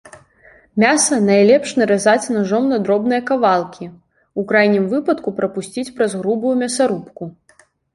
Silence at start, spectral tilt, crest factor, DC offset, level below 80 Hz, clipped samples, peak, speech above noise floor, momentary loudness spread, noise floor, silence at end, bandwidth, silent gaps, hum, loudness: 0.05 s; -4.5 dB/octave; 16 dB; under 0.1%; -60 dBFS; under 0.1%; -2 dBFS; 33 dB; 14 LU; -49 dBFS; 0.65 s; 11.5 kHz; none; none; -16 LUFS